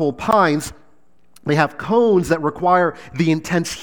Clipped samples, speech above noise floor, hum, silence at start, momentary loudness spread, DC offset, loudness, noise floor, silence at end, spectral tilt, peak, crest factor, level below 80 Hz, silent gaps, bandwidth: under 0.1%; 42 dB; none; 0 s; 7 LU; 0.5%; -18 LUFS; -60 dBFS; 0 s; -6 dB/octave; 0 dBFS; 18 dB; -48 dBFS; none; over 20 kHz